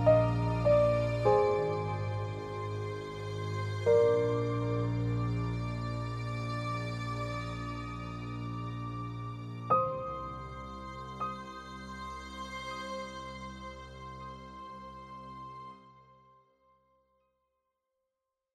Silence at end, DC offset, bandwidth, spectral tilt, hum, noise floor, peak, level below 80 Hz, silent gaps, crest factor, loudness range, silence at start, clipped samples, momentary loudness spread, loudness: 2.5 s; under 0.1%; 10 kHz; -7.5 dB/octave; none; -87 dBFS; -12 dBFS; -52 dBFS; none; 20 dB; 17 LU; 0 s; under 0.1%; 19 LU; -33 LUFS